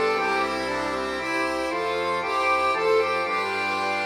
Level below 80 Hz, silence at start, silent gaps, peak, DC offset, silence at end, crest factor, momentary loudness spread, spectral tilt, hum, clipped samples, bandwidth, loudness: -54 dBFS; 0 s; none; -10 dBFS; under 0.1%; 0 s; 14 dB; 5 LU; -3.5 dB/octave; none; under 0.1%; 16 kHz; -24 LUFS